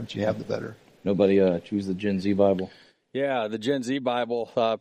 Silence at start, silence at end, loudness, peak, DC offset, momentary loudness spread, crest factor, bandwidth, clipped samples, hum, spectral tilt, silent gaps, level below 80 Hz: 0 s; 0 s; -26 LUFS; -8 dBFS; under 0.1%; 11 LU; 18 dB; 10 kHz; under 0.1%; none; -7 dB/octave; none; -66 dBFS